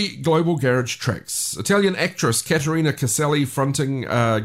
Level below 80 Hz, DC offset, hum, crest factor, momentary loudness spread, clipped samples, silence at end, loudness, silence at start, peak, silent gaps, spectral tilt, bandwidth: -54 dBFS; 0.1%; none; 14 dB; 5 LU; under 0.1%; 0 s; -20 LUFS; 0 s; -6 dBFS; none; -4.5 dB/octave; 16 kHz